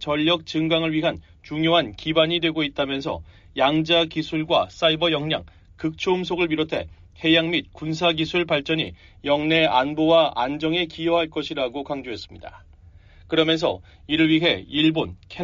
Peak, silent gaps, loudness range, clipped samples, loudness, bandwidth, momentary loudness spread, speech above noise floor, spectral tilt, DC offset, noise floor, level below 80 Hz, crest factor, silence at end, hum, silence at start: -6 dBFS; none; 3 LU; under 0.1%; -22 LUFS; 7.4 kHz; 12 LU; 26 dB; -3 dB/octave; under 0.1%; -49 dBFS; -50 dBFS; 16 dB; 0 s; none; 0 s